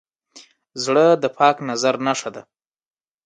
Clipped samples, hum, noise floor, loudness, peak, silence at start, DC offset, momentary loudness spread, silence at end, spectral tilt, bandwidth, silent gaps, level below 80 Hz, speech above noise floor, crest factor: under 0.1%; none; -49 dBFS; -18 LUFS; -2 dBFS; 0.35 s; under 0.1%; 13 LU; 0.85 s; -4 dB/octave; 9.4 kHz; none; -72 dBFS; 31 dB; 20 dB